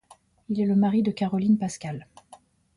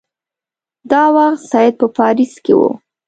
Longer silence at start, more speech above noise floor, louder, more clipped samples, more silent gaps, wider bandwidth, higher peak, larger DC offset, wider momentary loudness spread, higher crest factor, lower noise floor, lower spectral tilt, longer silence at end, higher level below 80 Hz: second, 0.5 s vs 0.85 s; second, 30 dB vs 77 dB; second, -25 LUFS vs -13 LUFS; neither; neither; first, 11 kHz vs 9 kHz; second, -12 dBFS vs 0 dBFS; neither; first, 14 LU vs 5 LU; about the same, 14 dB vs 14 dB; second, -54 dBFS vs -89 dBFS; about the same, -7 dB/octave vs -6 dB/octave; first, 0.75 s vs 0.3 s; about the same, -64 dBFS vs -60 dBFS